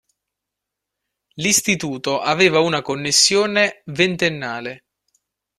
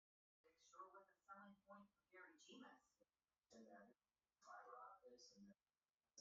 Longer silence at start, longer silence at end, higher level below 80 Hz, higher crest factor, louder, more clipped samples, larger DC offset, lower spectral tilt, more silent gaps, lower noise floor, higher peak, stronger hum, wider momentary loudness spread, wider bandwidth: first, 1.35 s vs 0.45 s; first, 0.8 s vs 0 s; first, -60 dBFS vs under -90 dBFS; about the same, 20 dB vs 20 dB; first, -17 LUFS vs -66 LUFS; neither; neither; about the same, -2.5 dB/octave vs -2.5 dB/octave; neither; second, -83 dBFS vs under -90 dBFS; first, 0 dBFS vs -48 dBFS; neither; first, 11 LU vs 6 LU; first, 14.5 kHz vs 7.4 kHz